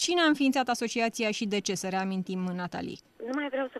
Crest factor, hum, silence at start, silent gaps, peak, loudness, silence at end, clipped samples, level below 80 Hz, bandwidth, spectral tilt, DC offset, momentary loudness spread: 14 dB; none; 0 s; none; -14 dBFS; -29 LUFS; 0 s; under 0.1%; -70 dBFS; 13.5 kHz; -4 dB/octave; under 0.1%; 12 LU